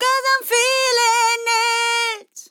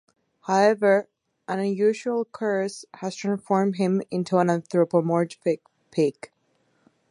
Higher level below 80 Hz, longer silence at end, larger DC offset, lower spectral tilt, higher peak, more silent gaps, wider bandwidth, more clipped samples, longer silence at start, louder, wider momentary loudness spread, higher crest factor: second, under -90 dBFS vs -76 dBFS; second, 0.1 s vs 0.85 s; neither; second, 5 dB/octave vs -6.5 dB/octave; about the same, -4 dBFS vs -6 dBFS; neither; first, 19.5 kHz vs 11 kHz; neither; second, 0 s vs 0.45 s; first, -16 LUFS vs -24 LUFS; second, 5 LU vs 11 LU; about the same, 16 dB vs 18 dB